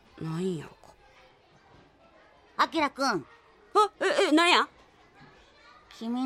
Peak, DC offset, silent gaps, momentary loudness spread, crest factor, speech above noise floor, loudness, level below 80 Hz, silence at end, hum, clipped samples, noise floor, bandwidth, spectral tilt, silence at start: -8 dBFS; under 0.1%; none; 17 LU; 22 dB; 33 dB; -26 LUFS; -68 dBFS; 0 s; none; under 0.1%; -59 dBFS; 15.5 kHz; -4 dB/octave; 0.15 s